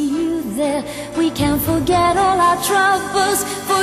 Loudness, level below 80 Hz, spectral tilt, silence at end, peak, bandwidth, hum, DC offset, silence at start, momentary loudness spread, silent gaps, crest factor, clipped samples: -17 LUFS; -40 dBFS; -4 dB/octave; 0 s; -4 dBFS; 15.5 kHz; none; under 0.1%; 0 s; 6 LU; none; 14 dB; under 0.1%